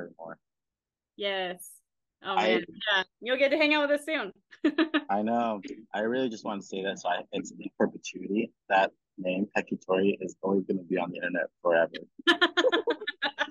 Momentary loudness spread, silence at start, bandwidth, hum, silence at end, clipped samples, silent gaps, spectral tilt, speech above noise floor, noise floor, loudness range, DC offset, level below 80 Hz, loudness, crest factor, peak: 13 LU; 0 s; 12 kHz; none; 0 s; under 0.1%; none; -4.5 dB/octave; over 61 dB; under -90 dBFS; 4 LU; under 0.1%; -78 dBFS; -29 LUFS; 22 dB; -8 dBFS